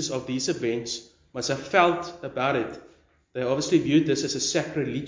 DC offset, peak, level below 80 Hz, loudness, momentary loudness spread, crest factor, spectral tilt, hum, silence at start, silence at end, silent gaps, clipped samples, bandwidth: under 0.1%; -6 dBFS; -60 dBFS; -25 LUFS; 13 LU; 20 dB; -4 dB/octave; none; 0 s; 0 s; none; under 0.1%; 7.6 kHz